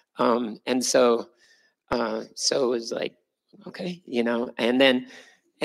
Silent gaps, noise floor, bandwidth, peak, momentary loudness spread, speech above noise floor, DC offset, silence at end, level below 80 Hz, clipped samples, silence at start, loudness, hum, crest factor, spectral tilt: none; -62 dBFS; 15.5 kHz; -4 dBFS; 15 LU; 37 dB; under 0.1%; 0 s; -64 dBFS; under 0.1%; 0.2 s; -24 LUFS; none; 20 dB; -3 dB/octave